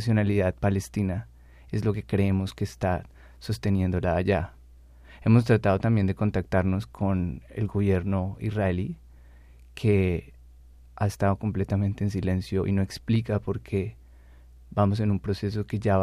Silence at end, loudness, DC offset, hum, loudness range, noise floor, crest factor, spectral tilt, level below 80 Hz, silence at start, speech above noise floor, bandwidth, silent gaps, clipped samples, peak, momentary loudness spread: 0 s; -27 LUFS; under 0.1%; none; 4 LU; -50 dBFS; 20 dB; -8 dB/octave; -48 dBFS; 0 s; 25 dB; 12.5 kHz; none; under 0.1%; -6 dBFS; 9 LU